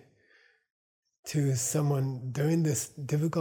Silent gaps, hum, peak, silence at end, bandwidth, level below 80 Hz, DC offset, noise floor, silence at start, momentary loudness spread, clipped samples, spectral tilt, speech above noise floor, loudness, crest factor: none; none; -16 dBFS; 0 s; 19.5 kHz; -70 dBFS; under 0.1%; -65 dBFS; 1.25 s; 6 LU; under 0.1%; -6 dB/octave; 36 dB; -30 LUFS; 16 dB